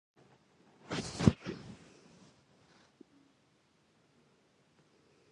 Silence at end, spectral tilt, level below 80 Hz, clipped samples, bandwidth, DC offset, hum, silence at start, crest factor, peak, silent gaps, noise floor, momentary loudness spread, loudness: 3.55 s; -6 dB/octave; -54 dBFS; under 0.1%; 11.5 kHz; under 0.1%; none; 0.9 s; 34 dB; -6 dBFS; none; -71 dBFS; 28 LU; -34 LUFS